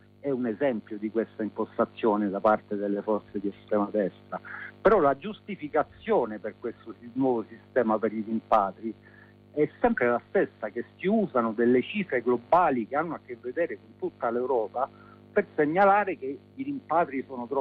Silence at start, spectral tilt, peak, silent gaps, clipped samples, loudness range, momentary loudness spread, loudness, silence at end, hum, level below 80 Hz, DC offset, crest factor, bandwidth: 0.25 s; -9 dB/octave; -10 dBFS; none; under 0.1%; 2 LU; 14 LU; -28 LUFS; 0 s; 50 Hz at -55 dBFS; -62 dBFS; under 0.1%; 18 dB; 5.2 kHz